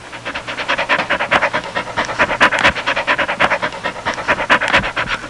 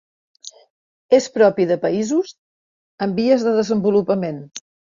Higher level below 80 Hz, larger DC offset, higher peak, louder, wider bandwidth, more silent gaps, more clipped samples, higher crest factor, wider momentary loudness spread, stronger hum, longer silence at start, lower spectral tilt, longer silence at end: first, -42 dBFS vs -62 dBFS; first, 0.2% vs under 0.1%; about the same, -2 dBFS vs -2 dBFS; about the same, -16 LUFS vs -18 LUFS; first, 11.5 kHz vs 7.6 kHz; second, none vs 0.70-1.09 s, 2.38-2.98 s; neither; about the same, 16 dB vs 18 dB; second, 9 LU vs 22 LU; neither; second, 0 s vs 0.45 s; second, -3 dB/octave vs -6 dB/octave; second, 0 s vs 0.3 s